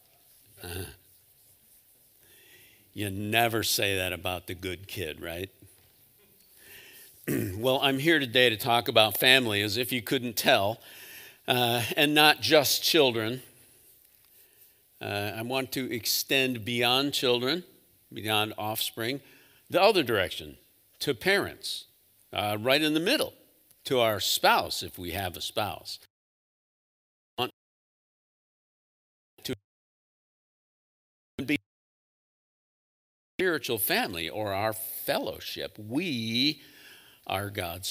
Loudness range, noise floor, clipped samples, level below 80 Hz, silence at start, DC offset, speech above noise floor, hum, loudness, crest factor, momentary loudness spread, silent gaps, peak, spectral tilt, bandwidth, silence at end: 16 LU; -61 dBFS; under 0.1%; -64 dBFS; 0.6 s; under 0.1%; 33 dB; none; -26 LUFS; 26 dB; 18 LU; 26.10-27.37 s, 27.53-29.37 s, 29.64-31.38 s, 31.66-33.39 s; -4 dBFS; -3 dB/octave; 16.5 kHz; 0 s